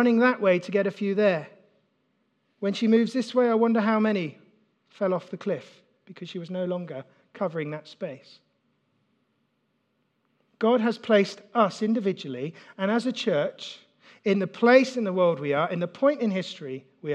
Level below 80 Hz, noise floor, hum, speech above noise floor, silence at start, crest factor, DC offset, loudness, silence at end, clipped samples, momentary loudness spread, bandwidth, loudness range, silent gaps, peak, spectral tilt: -88 dBFS; -73 dBFS; none; 48 dB; 0 s; 22 dB; under 0.1%; -25 LUFS; 0 s; under 0.1%; 16 LU; 9.2 kHz; 11 LU; none; -4 dBFS; -6.5 dB/octave